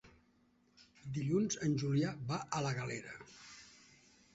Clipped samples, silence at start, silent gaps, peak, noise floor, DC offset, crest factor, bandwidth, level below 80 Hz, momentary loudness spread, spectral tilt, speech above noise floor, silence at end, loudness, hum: under 0.1%; 0.05 s; none; -20 dBFS; -72 dBFS; under 0.1%; 20 dB; 8 kHz; -70 dBFS; 20 LU; -6 dB/octave; 35 dB; 0.6 s; -37 LUFS; none